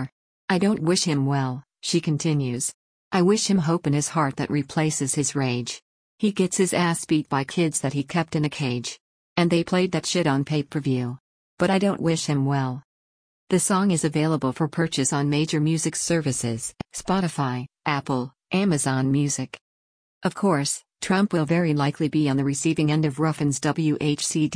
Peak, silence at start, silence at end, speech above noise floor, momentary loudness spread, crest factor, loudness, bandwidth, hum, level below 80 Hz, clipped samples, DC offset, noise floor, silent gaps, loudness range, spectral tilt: -8 dBFS; 0 s; 0.05 s; over 67 dB; 8 LU; 16 dB; -23 LUFS; 10.5 kHz; none; -58 dBFS; under 0.1%; under 0.1%; under -90 dBFS; 0.12-0.48 s, 2.74-3.11 s, 5.82-6.18 s, 9.00-9.36 s, 11.20-11.57 s, 12.84-13.47 s, 19.61-20.21 s; 2 LU; -5 dB/octave